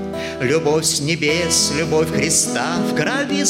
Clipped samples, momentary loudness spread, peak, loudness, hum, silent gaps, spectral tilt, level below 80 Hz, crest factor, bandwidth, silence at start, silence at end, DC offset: under 0.1%; 4 LU; -4 dBFS; -17 LUFS; none; none; -3 dB/octave; -46 dBFS; 14 dB; 16.5 kHz; 0 s; 0 s; under 0.1%